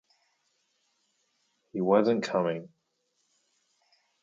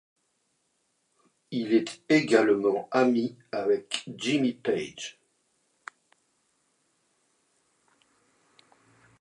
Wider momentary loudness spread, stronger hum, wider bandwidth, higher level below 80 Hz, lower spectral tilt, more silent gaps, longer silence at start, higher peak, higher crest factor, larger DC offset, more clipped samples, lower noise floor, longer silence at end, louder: second, 14 LU vs 18 LU; neither; second, 7.6 kHz vs 11 kHz; about the same, -80 dBFS vs -78 dBFS; first, -6.5 dB/octave vs -5 dB/octave; neither; first, 1.75 s vs 1.5 s; second, -10 dBFS vs -6 dBFS; about the same, 22 dB vs 24 dB; neither; neither; about the same, -77 dBFS vs -74 dBFS; second, 1.55 s vs 4.1 s; about the same, -27 LUFS vs -26 LUFS